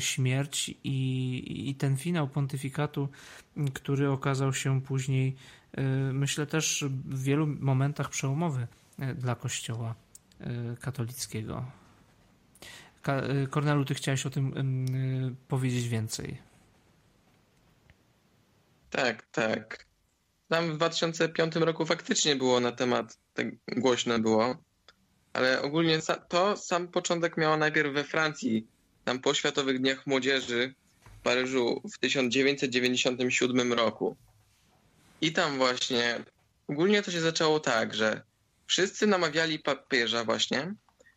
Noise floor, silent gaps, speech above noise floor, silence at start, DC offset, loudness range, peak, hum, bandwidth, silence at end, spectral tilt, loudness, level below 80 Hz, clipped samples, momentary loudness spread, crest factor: -72 dBFS; none; 43 dB; 0 s; under 0.1%; 8 LU; -12 dBFS; none; 16 kHz; 0.4 s; -4.5 dB/octave; -29 LUFS; -66 dBFS; under 0.1%; 11 LU; 18 dB